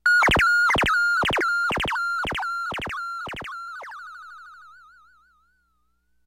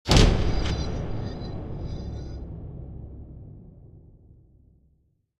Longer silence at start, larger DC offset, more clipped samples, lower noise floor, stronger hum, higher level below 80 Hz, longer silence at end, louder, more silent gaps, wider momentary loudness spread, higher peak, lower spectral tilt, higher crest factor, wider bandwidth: about the same, 0.05 s vs 0.05 s; neither; neither; about the same, -68 dBFS vs -67 dBFS; first, 60 Hz at -60 dBFS vs none; second, -44 dBFS vs -30 dBFS; first, 1.55 s vs 1.4 s; first, -22 LUFS vs -28 LUFS; neither; second, 21 LU vs 24 LU; second, -8 dBFS vs -2 dBFS; second, -3 dB/octave vs -5 dB/octave; second, 16 dB vs 26 dB; first, 16.5 kHz vs 12.5 kHz